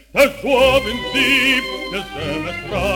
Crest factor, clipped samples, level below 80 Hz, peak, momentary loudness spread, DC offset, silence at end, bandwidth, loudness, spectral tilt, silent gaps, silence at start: 16 dB; under 0.1%; -36 dBFS; -2 dBFS; 11 LU; under 0.1%; 0 s; 19 kHz; -17 LUFS; -3.5 dB/octave; none; 0.15 s